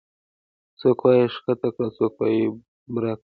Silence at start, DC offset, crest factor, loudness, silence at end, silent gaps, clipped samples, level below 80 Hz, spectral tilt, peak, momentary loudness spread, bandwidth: 0.8 s; under 0.1%; 18 dB; -22 LUFS; 0.05 s; 2.68-2.86 s; under 0.1%; -64 dBFS; -10.5 dB/octave; -6 dBFS; 10 LU; 4.9 kHz